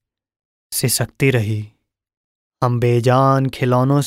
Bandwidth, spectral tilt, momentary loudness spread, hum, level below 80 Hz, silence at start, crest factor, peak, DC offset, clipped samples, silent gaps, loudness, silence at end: 16 kHz; -5.5 dB/octave; 10 LU; none; -50 dBFS; 0.7 s; 14 dB; -4 dBFS; under 0.1%; under 0.1%; 2.17-2.51 s; -17 LUFS; 0 s